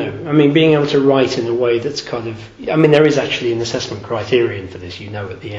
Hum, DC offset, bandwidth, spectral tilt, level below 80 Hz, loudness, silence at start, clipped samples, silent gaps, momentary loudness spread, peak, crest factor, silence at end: none; under 0.1%; 7.8 kHz; -6 dB/octave; -50 dBFS; -15 LUFS; 0 s; under 0.1%; none; 16 LU; 0 dBFS; 16 dB; 0 s